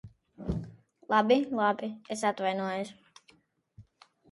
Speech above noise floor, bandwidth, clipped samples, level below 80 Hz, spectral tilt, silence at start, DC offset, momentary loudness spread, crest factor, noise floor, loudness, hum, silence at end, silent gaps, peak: 37 dB; 11.5 kHz; under 0.1%; -54 dBFS; -5.5 dB/octave; 0.05 s; under 0.1%; 15 LU; 20 dB; -65 dBFS; -30 LUFS; none; 0.5 s; none; -10 dBFS